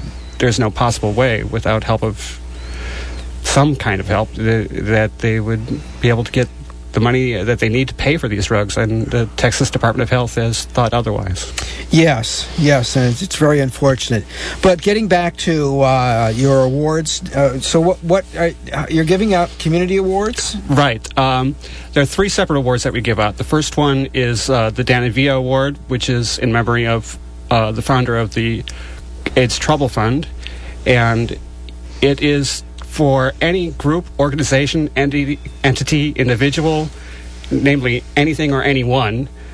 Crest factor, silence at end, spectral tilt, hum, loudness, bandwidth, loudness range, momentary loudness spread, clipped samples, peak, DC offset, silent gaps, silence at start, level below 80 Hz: 16 dB; 0 s; -5.5 dB/octave; none; -16 LUFS; 11 kHz; 3 LU; 10 LU; under 0.1%; 0 dBFS; under 0.1%; none; 0 s; -30 dBFS